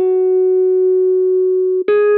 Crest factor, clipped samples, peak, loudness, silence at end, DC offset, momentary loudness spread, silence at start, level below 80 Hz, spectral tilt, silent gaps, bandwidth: 8 dB; under 0.1%; -6 dBFS; -14 LUFS; 0 s; under 0.1%; 1 LU; 0 s; -70 dBFS; -10 dB/octave; none; 4.1 kHz